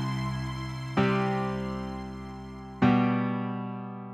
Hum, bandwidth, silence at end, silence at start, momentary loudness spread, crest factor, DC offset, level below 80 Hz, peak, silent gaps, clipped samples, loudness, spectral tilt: none; 11 kHz; 0 s; 0 s; 15 LU; 18 dB; under 0.1%; -48 dBFS; -12 dBFS; none; under 0.1%; -29 LUFS; -7.5 dB/octave